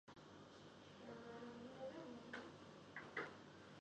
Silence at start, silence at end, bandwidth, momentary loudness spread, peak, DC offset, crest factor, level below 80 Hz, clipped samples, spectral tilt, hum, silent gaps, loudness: 0.05 s; 0 s; 9.4 kHz; 11 LU; -34 dBFS; under 0.1%; 22 dB; -82 dBFS; under 0.1%; -5 dB/octave; none; none; -56 LUFS